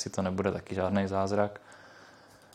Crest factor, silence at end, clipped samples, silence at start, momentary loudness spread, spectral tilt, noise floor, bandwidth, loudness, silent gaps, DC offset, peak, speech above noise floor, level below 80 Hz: 20 dB; 0.45 s; under 0.1%; 0 s; 21 LU; -6 dB/octave; -56 dBFS; 11 kHz; -31 LUFS; none; under 0.1%; -12 dBFS; 25 dB; -68 dBFS